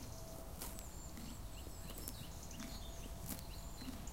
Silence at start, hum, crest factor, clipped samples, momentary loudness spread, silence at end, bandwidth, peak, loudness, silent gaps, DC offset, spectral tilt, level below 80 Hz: 0 s; none; 26 dB; under 0.1%; 4 LU; 0 s; 17 kHz; -24 dBFS; -50 LUFS; none; 0.1%; -4 dB/octave; -52 dBFS